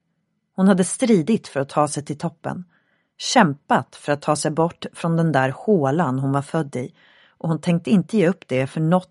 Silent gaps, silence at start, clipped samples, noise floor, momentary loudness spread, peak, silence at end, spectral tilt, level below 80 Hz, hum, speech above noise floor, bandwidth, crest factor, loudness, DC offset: none; 0.6 s; under 0.1%; -72 dBFS; 12 LU; 0 dBFS; 0.05 s; -6 dB/octave; -64 dBFS; none; 52 dB; 11.5 kHz; 20 dB; -21 LUFS; under 0.1%